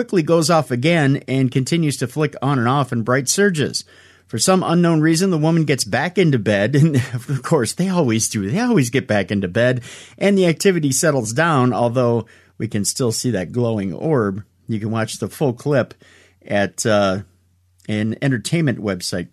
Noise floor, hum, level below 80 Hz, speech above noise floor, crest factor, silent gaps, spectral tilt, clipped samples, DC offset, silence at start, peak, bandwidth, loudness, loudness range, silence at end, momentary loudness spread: -58 dBFS; none; -58 dBFS; 40 dB; 14 dB; none; -5 dB/octave; under 0.1%; under 0.1%; 0 s; -4 dBFS; 13.5 kHz; -18 LUFS; 4 LU; 0.05 s; 8 LU